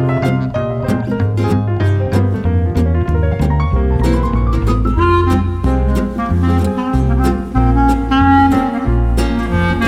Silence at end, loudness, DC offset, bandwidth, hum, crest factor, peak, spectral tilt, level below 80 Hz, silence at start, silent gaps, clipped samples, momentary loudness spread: 0 s; -15 LUFS; under 0.1%; 13 kHz; none; 12 dB; 0 dBFS; -8 dB/octave; -20 dBFS; 0 s; none; under 0.1%; 4 LU